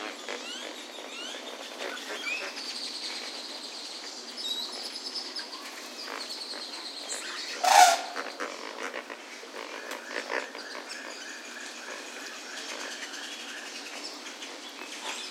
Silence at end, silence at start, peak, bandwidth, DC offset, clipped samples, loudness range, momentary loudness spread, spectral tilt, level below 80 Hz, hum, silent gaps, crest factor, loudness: 0 s; 0 s; -4 dBFS; 16 kHz; under 0.1%; under 0.1%; 11 LU; 8 LU; 1.5 dB/octave; under -90 dBFS; none; none; 30 dB; -32 LUFS